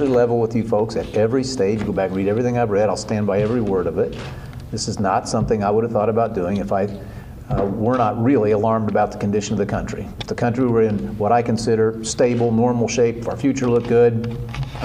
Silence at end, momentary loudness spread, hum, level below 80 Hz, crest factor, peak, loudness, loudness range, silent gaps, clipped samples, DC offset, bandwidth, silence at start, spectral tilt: 0 s; 9 LU; none; -40 dBFS; 14 dB; -4 dBFS; -20 LUFS; 2 LU; none; under 0.1%; under 0.1%; 10.5 kHz; 0 s; -6.5 dB/octave